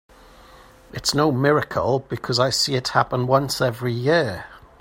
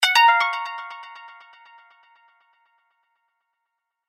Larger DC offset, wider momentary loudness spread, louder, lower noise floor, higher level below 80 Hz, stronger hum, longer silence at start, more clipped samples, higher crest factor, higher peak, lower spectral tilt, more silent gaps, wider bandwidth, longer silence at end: neither; second, 7 LU vs 26 LU; second, -21 LUFS vs -18 LUFS; second, -48 dBFS vs -80 dBFS; first, -52 dBFS vs under -90 dBFS; neither; first, 0.95 s vs 0 s; neither; about the same, 20 dB vs 22 dB; about the same, -2 dBFS vs -4 dBFS; first, -4.5 dB/octave vs 4 dB/octave; neither; about the same, 16 kHz vs 16 kHz; second, 0.2 s vs 2.8 s